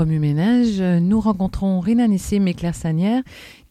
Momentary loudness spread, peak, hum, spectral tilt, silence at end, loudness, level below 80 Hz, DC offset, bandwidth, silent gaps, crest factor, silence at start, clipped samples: 5 LU; -8 dBFS; none; -7.5 dB/octave; 0.2 s; -19 LUFS; -38 dBFS; under 0.1%; 13.5 kHz; none; 12 dB; 0 s; under 0.1%